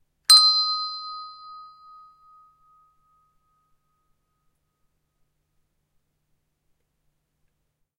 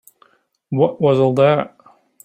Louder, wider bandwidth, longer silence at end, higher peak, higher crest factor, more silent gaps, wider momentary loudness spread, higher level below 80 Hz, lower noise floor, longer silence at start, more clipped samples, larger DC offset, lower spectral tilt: about the same, -16 LUFS vs -16 LUFS; about the same, 16 kHz vs 15.5 kHz; first, 6.4 s vs 0.6 s; about the same, 0 dBFS vs -2 dBFS; first, 28 dB vs 16 dB; neither; first, 25 LU vs 11 LU; second, -76 dBFS vs -60 dBFS; first, -75 dBFS vs -56 dBFS; second, 0.3 s vs 0.7 s; neither; neither; second, 5.5 dB/octave vs -8 dB/octave